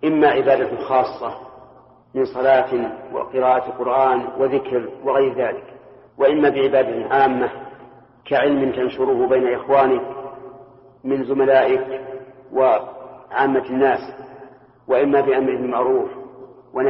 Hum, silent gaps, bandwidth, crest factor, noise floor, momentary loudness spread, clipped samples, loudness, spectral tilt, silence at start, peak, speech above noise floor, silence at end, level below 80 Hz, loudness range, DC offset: none; none; 5.8 kHz; 16 dB; -48 dBFS; 17 LU; under 0.1%; -19 LUFS; -4 dB/octave; 0 s; -4 dBFS; 30 dB; 0 s; -58 dBFS; 2 LU; under 0.1%